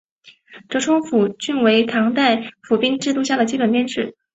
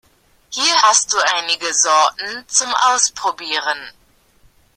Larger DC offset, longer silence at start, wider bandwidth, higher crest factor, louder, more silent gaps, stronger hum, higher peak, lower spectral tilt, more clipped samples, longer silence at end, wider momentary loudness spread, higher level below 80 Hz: neither; second, 0.25 s vs 0.5 s; second, 8.2 kHz vs 15.5 kHz; about the same, 16 dB vs 18 dB; second, -18 LUFS vs -15 LUFS; neither; neither; about the same, -2 dBFS vs 0 dBFS; first, -4 dB/octave vs 2.5 dB/octave; neither; second, 0.25 s vs 0.85 s; second, 7 LU vs 11 LU; about the same, -62 dBFS vs -60 dBFS